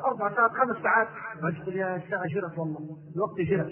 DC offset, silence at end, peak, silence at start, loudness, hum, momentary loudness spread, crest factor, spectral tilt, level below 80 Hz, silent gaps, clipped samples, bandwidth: under 0.1%; 0 s; -8 dBFS; 0 s; -28 LUFS; none; 10 LU; 20 dB; -11.5 dB/octave; -66 dBFS; none; under 0.1%; 3.3 kHz